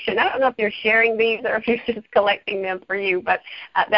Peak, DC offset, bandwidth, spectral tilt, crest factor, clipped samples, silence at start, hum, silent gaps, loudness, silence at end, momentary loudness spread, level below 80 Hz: -4 dBFS; under 0.1%; 5.6 kHz; -7.5 dB/octave; 16 dB; under 0.1%; 0 s; none; none; -20 LUFS; 0 s; 8 LU; -58 dBFS